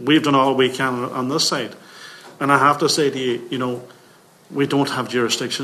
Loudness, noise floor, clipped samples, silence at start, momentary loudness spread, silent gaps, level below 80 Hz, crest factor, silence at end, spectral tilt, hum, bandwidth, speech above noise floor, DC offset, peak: -19 LUFS; -50 dBFS; under 0.1%; 0 s; 17 LU; none; -66 dBFS; 20 dB; 0 s; -4 dB/octave; none; 14 kHz; 31 dB; under 0.1%; 0 dBFS